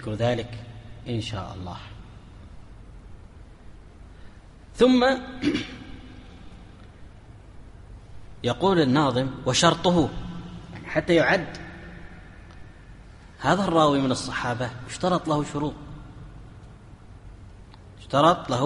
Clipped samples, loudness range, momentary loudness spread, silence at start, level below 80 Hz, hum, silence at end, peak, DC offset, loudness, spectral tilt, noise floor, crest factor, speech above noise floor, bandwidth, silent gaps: under 0.1%; 12 LU; 26 LU; 0 s; -46 dBFS; none; 0 s; -4 dBFS; under 0.1%; -23 LUFS; -5 dB/octave; -46 dBFS; 22 dB; 23 dB; 11.5 kHz; none